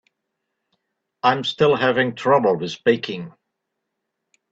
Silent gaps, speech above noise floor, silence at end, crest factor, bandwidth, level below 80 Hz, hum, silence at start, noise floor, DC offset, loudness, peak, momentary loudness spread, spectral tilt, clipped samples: none; 60 dB; 1.25 s; 22 dB; 7.8 kHz; -64 dBFS; none; 1.25 s; -79 dBFS; under 0.1%; -19 LUFS; -2 dBFS; 11 LU; -5.5 dB/octave; under 0.1%